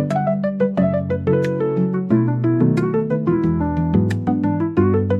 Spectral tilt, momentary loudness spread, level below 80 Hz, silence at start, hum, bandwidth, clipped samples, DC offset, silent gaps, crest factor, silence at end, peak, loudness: -10 dB/octave; 3 LU; -46 dBFS; 0 s; none; 8.2 kHz; under 0.1%; 0.1%; none; 14 dB; 0 s; -4 dBFS; -19 LUFS